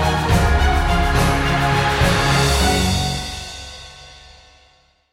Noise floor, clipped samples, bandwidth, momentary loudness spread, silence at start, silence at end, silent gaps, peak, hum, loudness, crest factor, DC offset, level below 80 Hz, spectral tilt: -55 dBFS; under 0.1%; 16.5 kHz; 16 LU; 0 s; 0.95 s; none; -4 dBFS; none; -17 LUFS; 14 dB; under 0.1%; -24 dBFS; -4.5 dB/octave